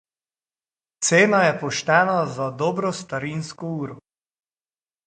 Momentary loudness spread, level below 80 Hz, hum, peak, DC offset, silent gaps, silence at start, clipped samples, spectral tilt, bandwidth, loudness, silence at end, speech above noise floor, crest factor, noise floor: 14 LU; -64 dBFS; none; -2 dBFS; under 0.1%; none; 1 s; under 0.1%; -4 dB/octave; 9.6 kHz; -21 LUFS; 1.1 s; over 69 dB; 20 dB; under -90 dBFS